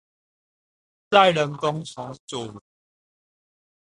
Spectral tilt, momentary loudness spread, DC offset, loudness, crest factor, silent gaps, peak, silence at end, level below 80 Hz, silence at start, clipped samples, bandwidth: -4.5 dB/octave; 19 LU; under 0.1%; -20 LUFS; 24 dB; 2.20-2.28 s; -2 dBFS; 1.35 s; -66 dBFS; 1.1 s; under 0.1%; 11.5 kHz